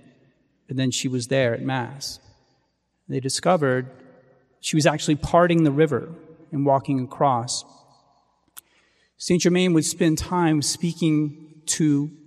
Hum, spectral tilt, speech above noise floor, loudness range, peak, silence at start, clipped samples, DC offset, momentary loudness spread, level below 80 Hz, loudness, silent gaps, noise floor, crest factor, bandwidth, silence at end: none; -5 dB/octave; 49 dB; 5 LU; -4 dBFS; 0.7 s; under 0.1%; under 0.1%; 13 LU; -50 dBFS; -22 LUFS; none; -71 dBFS; 20 dB; 15 kHz; 0.1 s